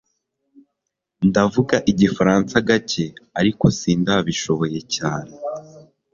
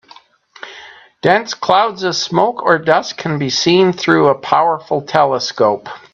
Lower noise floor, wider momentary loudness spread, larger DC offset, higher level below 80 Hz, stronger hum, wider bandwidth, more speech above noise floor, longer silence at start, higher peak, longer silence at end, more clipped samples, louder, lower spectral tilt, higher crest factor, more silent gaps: first, -79 dBFS vs -45 dBFS; first, 11 LU vs 8 LU; neither; first, -48 dBFS vs -58 dBFS; neither; about the same, 7.6 kHz vs 7.6 kHz; first, 61 dB vs 31 dB; first, 1.2 s vs 0.65 s; about the same, -2 dBFS vs 0 dBFS; first, 0.3 s vs 0.15 s; neither; second, -19 LUFS vs -14 LUFS; about the same, -5.5 dB/octave vs -4.5 dB/octave; about the same, 20 dB vs 16 dB; neither